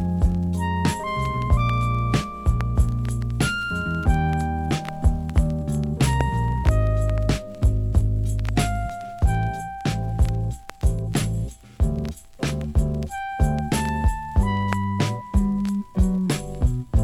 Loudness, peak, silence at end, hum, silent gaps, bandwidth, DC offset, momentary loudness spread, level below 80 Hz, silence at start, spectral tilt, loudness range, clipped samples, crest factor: -24 LUFS; -4 dBFS; 0 s; none; none; 14 kHz; under 0.1%; 5 LU; -26 dBFS; 0 s; -6.5 dB/octave; 3 LU; under 0.1%; 18 dB